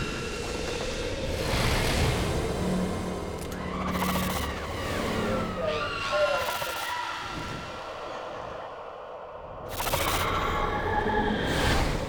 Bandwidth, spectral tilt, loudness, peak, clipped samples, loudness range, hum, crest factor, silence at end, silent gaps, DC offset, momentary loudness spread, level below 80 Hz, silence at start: over 20 kHz; -4.5 dB/octave; -29 LUFS; -12 dBFS; under 0.1%; 5 LU; none; 16 dB; 0 s; none; under 0.1%; 11 LU; -38 dBFS; 0 s